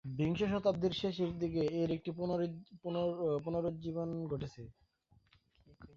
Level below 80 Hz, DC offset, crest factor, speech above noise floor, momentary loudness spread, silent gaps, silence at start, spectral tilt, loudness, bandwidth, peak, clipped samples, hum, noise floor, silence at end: -62 dBFS; under 0.1%; 18 dB; 34 dB; 9 LU; none; 0.05 s; -6.5 dB/octave; -37 LUFS; 7.2 kHz; -18 dBFS; under 0.1%; none; -70 dBFS; 0.1 s